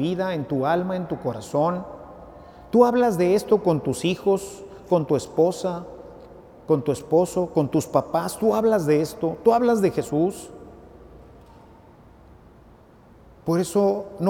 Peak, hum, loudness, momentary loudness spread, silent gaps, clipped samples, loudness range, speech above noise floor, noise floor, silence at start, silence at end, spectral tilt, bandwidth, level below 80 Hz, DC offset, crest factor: -4 dBFS; none; -22 LUFS; 18 LU; none; under 0.1%; 7 LU; 29 dB; -50 dBFS; 0 s; 0 s; -6.5 dB/octave; 17.5 kHz; -54 dBFS; under 0.1%; 20 dB